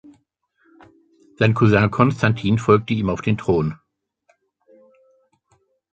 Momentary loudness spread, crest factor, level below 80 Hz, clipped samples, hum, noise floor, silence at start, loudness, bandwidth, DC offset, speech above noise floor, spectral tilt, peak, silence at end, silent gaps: 6 LU; 20 dB; -46 dBFS; under 0.1%; none; -65 dBFS; 1.4 s; -19 LUFS; 8 kHz; under 0.1%; 48 dB; -7.5 dB/octave; -2 dBFS; 2.2 s; none